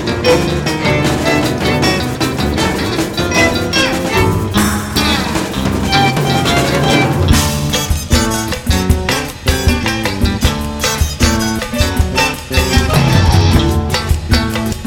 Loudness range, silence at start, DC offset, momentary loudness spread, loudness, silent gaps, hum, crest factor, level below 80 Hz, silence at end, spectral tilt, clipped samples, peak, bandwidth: 2 LU; 0 s; under 0.1%; 5 LU; -13 LUFS; none; none; 14 dB; -22 dBFS; 0 s; -4.5 dB/octave; under 0.1%; 0 dBFS; 18.5 kHz